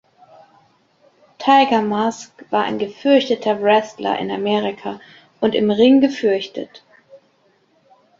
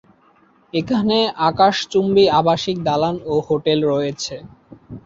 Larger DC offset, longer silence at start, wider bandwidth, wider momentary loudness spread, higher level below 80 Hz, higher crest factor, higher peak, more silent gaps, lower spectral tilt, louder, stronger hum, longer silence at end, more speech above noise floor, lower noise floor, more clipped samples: neither; first, 1.4 s vs 0.75 s; about the same, 7.6 kHz vs 7.8 kHz; first, 17 LU vs 11 LU; second, -64 dBFS vs -52 dBFS; about the same, 18 dB vs 16 dB; about the same, -2 dBFS vs -2 dBFS; neither; about the same, -5.5 dB/octave vs -5.5 dB/octave; about the same, -17 LUFS vs -18 LUFS; neither; first, 1.05 s vs 0.05 s; first, 42 dB vs 37 dB; first, -59 dBFS vs -54 dBFS; neither